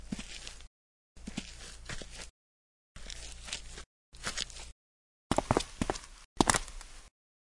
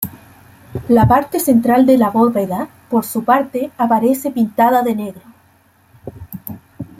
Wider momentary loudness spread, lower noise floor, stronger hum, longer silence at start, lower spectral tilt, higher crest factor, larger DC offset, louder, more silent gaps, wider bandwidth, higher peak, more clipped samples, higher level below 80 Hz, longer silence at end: about the same, 22 LU vs 20 LU; first, under -90 dBFS vs -53 dBFS; neither; about the same, 0 s vs 0 s; second, -3.5 dB/octave vs -6.5 dB/octave; first, 32 dB vs 16 dB; neither; second, -36 LUFS vs -15 LUFS; first, 0.67-1.15 s, 2.30-2.95 s, 3.86-4.12 s, 4.72-5.30 s, 6.25-6.36 s vs none; second, 11.5 kHz vs 16.5 kHz; second, -6 dBFS vs 0 dBFS; neither; about the same, -48 dBFS vs -46 dBFS; first, 0.45 s vs 0.15 s